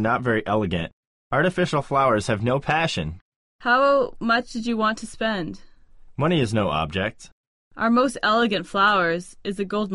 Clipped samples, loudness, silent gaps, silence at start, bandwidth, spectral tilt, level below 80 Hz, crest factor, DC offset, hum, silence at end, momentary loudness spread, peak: under 0.1%; -22 LUFS; 0.93-1.30 s, 3.21-3.59 s, 7.32-7.71 s; 0 s; 11.5 kHz; -5.5 dB/octave; -48 dBFS; 16 dB; under 0.1%; none; 0 s; 10 LU; -6 dBFS